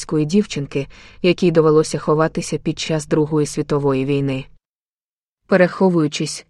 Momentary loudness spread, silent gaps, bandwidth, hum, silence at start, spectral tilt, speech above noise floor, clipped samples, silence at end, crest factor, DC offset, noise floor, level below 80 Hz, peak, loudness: 9 LU; 4.65-5.37 s; 12 kHz; none; 0 s; -6 dB/octave; over 72 dB; under 0.1%; 0.1 s; 18 dB; under 0.1%; under -90 dBFS; -46 dBFS; 0 dBFS; -18 LUFS